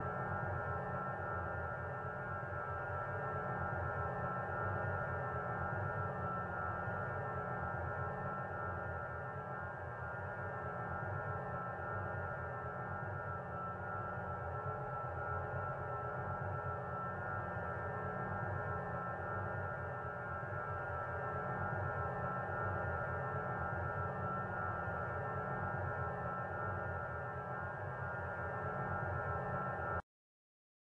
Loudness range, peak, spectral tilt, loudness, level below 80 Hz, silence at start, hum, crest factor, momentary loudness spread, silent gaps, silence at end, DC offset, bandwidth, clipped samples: 3 LU; -26 dBFS; -9 dB/octave; -41 LUFS; -62 dBFS; 0 s; none; 14 dB; 3 LU; none; 1 s; under 0.1%; 5.8 kHz; under 0.1%